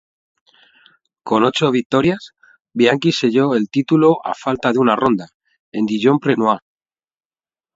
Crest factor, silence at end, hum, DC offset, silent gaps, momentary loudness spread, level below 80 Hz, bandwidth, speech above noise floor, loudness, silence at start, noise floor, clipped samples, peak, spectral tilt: 18 dB; 1.15 s; none; under 0.1%; 1.86-1.90 s, 2.60-2.65 s, 5.34-5.40 s, 5.60-5.72 s; 9 LU; -56 dBFS; 7.8 kHz; over 74 dB; -16 LUFS; 1.25 s; under -90 dBFS; under 0.1%; 0 dBFS; -6 dB/octave